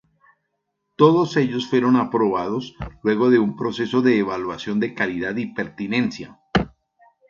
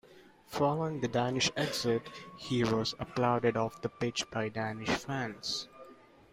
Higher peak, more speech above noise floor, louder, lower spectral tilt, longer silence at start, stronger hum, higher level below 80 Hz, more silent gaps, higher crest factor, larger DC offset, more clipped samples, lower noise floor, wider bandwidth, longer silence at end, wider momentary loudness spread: first, 0 dBFS vs -16 dBFS; first, 55 dB vs 25 dB; first, -21 LUFS vs -33 LUFS; first, -7 dB/octave vs -4.5 dB/octave; first, 1 s vs 0.1 s; neither; first, -48 dBFS vs -62 dBFS; neither; about the same, 20 dB vs 18 dB; neither; neither; first, -75 dBFS vs -58 dBFS; second, 7.2 kHz vs 16 kHz; first, 0.65 s vs 0.4 s; first, 10 LU vs 7 LU